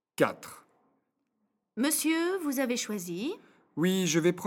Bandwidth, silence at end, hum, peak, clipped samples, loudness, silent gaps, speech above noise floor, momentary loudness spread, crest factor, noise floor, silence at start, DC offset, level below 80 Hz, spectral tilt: 18 kHz; 0 s; none; -10 dBFS; under 0.1%; -29 LUFS; none; 50 dB; 18 LU; 22 dB; -79 dBFS; 0.2 s; under 0.1%; -78 dBFS; -4 dB/octave